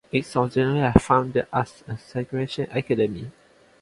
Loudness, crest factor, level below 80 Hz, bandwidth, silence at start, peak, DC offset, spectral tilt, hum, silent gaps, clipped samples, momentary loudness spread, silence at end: -23 LUFS; 24 dB; -42 dBFS; 11.5 kHz; 0.15 s; 0 dBFS; under 0.1%; -7 dB/octave; none; none; under 0.1%; 13 LU; 0.5 s